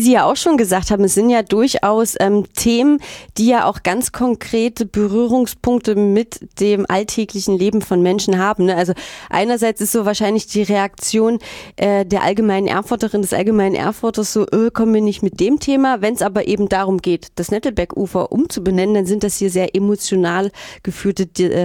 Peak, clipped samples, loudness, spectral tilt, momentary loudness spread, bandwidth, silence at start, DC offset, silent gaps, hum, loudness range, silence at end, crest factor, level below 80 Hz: -2 dBFS; under 0.1%; -16 LUFS; -5 dB/octave; 6 LU; 19 kHz; 0 s; under 0.1%; none; none; 3 LU; 0 s; 14 dB; -42 dBFS